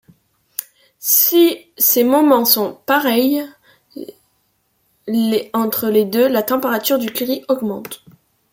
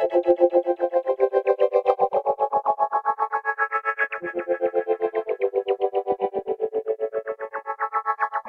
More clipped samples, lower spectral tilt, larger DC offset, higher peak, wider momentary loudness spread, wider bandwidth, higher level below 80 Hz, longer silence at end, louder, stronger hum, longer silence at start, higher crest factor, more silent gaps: neither; second, -3 dB/octave vs -6.5 dB/octave; neither; first, 0 dBFS vs -6 dBFS; first, 21 LU vs 7 LU; first, 17 kHz vs 4.9 kHz; about the same, -66 dBFS vs -70 dBFS; first, 0.55 s vs 0 s; first, -15 LUFS vs -24 LUFS; neither; first, 0.6 s vs 0 s; about the same, 18 dB vs 18 dB; neither